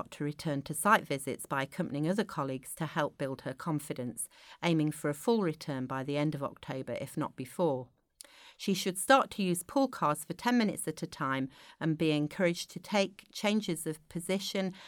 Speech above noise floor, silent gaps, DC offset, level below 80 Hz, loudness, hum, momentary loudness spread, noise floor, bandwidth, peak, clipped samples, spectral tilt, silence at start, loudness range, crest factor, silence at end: 24 dB; none; under 0.1%; -70 dBFS; -33 LUFS; none; 10 LU; -57 dBFS; over 20 kHz; -10 dBFS; under 0.1%; -5 dB/octave; 0 s; 4 LU; 24 dB; 0 s